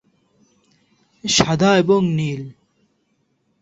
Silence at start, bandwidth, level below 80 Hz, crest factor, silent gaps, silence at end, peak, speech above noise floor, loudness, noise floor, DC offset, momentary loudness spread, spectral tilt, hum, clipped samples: 1.25 s; 8 kHz; -50 dBFS; 20 dB; none; 1.1 s; 0 dBFS; 50 dB; -17 LUFS; -67 dBFS; under 0.1%; 16 LU; -4.5 dB/octave; none; under 0.1%